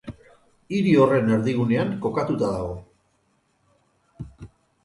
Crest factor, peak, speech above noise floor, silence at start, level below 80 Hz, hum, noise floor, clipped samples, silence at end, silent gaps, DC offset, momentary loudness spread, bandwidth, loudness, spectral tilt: 20 dB; -4 dBFS; 46 dB; 0.05 s; -50 dBFS; none; -67 dBFS; under 0.1%; 0.4 s; none; under 0.1%; 23 LU; 11.5 kHz; -22 LUFS; -8 dB/octave